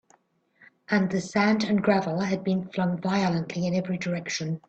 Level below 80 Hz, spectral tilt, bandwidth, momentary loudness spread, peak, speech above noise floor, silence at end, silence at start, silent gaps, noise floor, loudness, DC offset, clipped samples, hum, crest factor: -64 dBFS; -6 dB/octave; 8.4 kHz; 6 LU; -10 dBFS; 40 dB; 0.1 s; 0.9 s; none; -65 dBFS; -26 LUFS; under 0.1%; under 0.1%; none; 18 dB